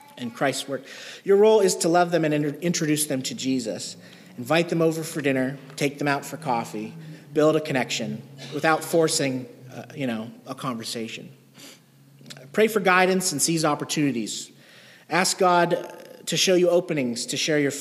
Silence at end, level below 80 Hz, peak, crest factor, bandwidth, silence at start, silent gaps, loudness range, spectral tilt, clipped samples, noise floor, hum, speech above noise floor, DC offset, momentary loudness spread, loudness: 0 s; -74 dBFS; -4 dBFS; 20 dB; 15.5 kHz; 0.15 s; none; 4 LU; -4 dB/octave; under 0.1%; -52 dBFS; none; 29 dB; under 0.1%; 17 LU; -23 LUFS